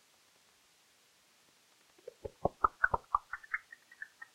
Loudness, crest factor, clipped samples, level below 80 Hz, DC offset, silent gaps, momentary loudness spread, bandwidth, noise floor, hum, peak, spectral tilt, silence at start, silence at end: -35 LUFS; 28 dB; under 0.1%; -58 dBFS; under 0.1%; none; 23 LU; 16 kHz; -68 dBFS; none; -12 dBFS; -5.5 dB/octave; 2.25 s; 0.1 s